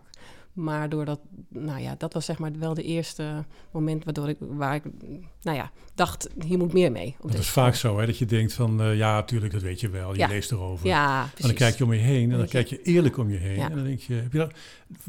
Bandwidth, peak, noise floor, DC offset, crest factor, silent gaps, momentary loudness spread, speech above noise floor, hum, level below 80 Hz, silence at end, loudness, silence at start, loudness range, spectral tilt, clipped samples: 18 kHz; -8 dBFS; -47 dBFS; 0.1%; 18 dB; none; 12 LU; 22 dB; none; -50 dBFS; 0 s; -26 LUFS; 0.05 s; 8 LU; -6 dB/octave; under 0.1%